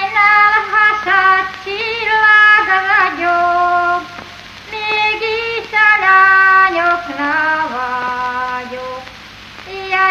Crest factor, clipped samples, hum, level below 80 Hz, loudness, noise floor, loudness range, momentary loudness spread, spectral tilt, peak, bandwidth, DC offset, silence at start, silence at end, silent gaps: 14 dB; under 0.1%; 50 Hz at -55 dBFS; -50 dBFS; -12 LUFS; -35 dBFS; 4 LU; 19 LU; -3 dB/octave; 0 dBFS; 14 kHz; under 0.1%; 0 s; 0 s; none